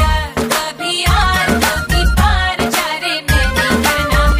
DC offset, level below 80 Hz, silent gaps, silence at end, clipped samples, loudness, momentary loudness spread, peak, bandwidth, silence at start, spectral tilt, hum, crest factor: under 0.1%; -18 dBFS; none; 0 s; under 0.1%; -14 LUFS; 4 LU; 0 dBFS; 16 kHz; 0 s; -4 dB/octave; none; 14 dB